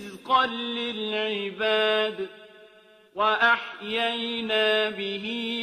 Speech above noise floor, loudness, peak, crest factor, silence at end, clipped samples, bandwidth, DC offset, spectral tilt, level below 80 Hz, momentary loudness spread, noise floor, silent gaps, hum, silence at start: 29 dB; -25 LUFS; -8 dBFS; 18 dB; 0 s; under 0.1%; 14.5 kHz; under 0.1%; -4 dB/octave; -72 dBFS; 8 LU; -54 dBFS; none; none; 0 s